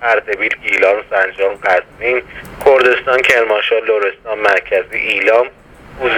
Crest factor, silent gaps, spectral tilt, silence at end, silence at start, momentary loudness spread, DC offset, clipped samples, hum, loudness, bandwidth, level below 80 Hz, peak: 14 dB; none; -3.5 dB/octave; 0 s; 0 s; 6 LU; under 0.1%; under 0.1%; none; -13 LUFS; 20 kHz; -46 dBFS; 0 dBFS